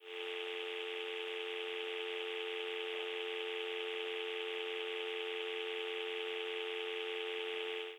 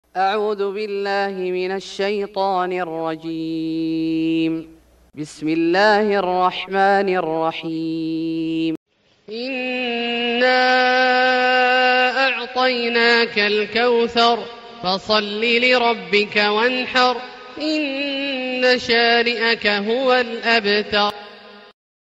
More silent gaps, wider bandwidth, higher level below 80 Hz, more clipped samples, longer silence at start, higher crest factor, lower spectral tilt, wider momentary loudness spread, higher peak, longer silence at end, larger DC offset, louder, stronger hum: second, none vs 8.77-8.86 s; first, 14 kHz vs 9.4 kHz; second, under -90 dBFS vs -60 dBFS; neither; second, 0 s vs 0.15 s; about the same, 14 dB vs 16 dB; second, -1 dB/octave vs -4.5 dB/octave; second, 1 LU vs 10 LU; second, -26 dBFS vs -2 dBFS; second, 0 s vs 0.5 s; neither; second, -40 LUFS vs -18 LUFS; neither